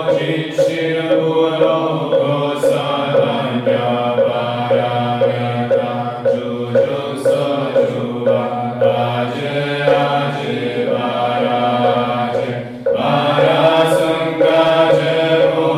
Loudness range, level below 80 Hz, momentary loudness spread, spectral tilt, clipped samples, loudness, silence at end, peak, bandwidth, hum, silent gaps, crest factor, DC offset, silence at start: 3 LU; -58 dBFS; 6 LU; -6.5 dB/octave; under 0.1%; -16 LUFS; 0 s; -2 dBFS; 13.5 kHz; none; none; 14 dB; under 0.1%; 0 s